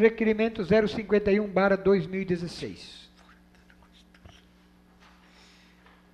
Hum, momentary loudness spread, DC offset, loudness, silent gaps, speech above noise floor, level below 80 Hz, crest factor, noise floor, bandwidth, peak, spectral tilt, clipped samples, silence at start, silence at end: none; 16 LU; under 0.1%; -25 LUFS; none; 33 dB; -54 dBFS; 20 dB; -58 dBFS; 10 kHz; -8 dBFS; -7 dB/octave; under 0.1%; 0 s; 3.15 s